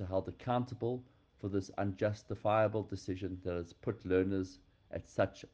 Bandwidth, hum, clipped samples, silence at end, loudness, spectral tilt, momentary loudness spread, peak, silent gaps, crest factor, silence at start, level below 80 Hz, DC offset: 8.6 kHz; none; under 0.1%; 0.1 s; -37 LUFS; -7.5 dB/octave; 10 LU; -18 dBFS; none; 18 dB; 0 s; -64 dBFS; under 0.1%